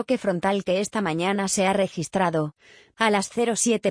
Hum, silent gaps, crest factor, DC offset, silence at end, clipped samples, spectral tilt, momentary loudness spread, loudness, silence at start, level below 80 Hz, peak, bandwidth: none; none; 18 dB; under 0.1%; 0 s; under 0.1%; -4 dB/octave; 4 LU; -24 LUFS; 0 s; -62 dBFS; -6 dBFS; 10.5 kHz